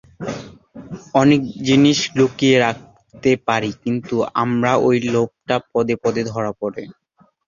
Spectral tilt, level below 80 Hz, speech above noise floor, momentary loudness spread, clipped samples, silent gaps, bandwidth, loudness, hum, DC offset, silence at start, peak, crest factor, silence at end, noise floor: -5.5 dB/octave; -54 dBFS; 22 dB; 15 LU; under 0.1%; none; 7.4 kHz; -18 LUFS; none; under 0.1%; 0.2 s; -2 dBFS; 18 dB; 0.55 s; -39 dBFS